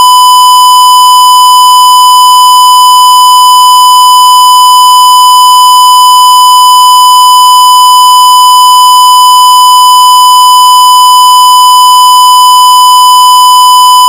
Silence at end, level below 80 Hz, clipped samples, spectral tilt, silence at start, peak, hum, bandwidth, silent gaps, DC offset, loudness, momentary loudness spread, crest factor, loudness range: 0 s; -60 dBFS; 20%; 3.5 dB/octave; 0 s; 0 dBFS; none; over 20 kHz; none; 0.3%; 0 LUFS; 0 LU; 0 dB; 0 LU